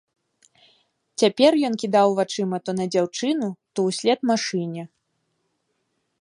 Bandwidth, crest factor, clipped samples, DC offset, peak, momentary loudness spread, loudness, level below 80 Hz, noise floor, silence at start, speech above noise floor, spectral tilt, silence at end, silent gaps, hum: 11.5 kHz; 20 dB; under 0.1%; under 0.1%; -4 dBFS; 11 LU; -22 LUFS; -72 dBFS; -73 dBFS; 1.2 s; 52 dB; -5 dB/octave; 1.35 s; none; none